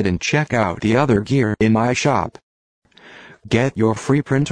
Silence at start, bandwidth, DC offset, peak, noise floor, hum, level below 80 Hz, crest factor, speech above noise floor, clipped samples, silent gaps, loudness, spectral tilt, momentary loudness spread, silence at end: 0 s; 10 kHz; under 0.1%; -4 dBFS; -43 dBFS; none; -46 dBFS; 16 dB; 26 dB; under 0.1%; 2.43-2.82 s; -18 LUFS; -6 dB/octave; 3 LU; 0 s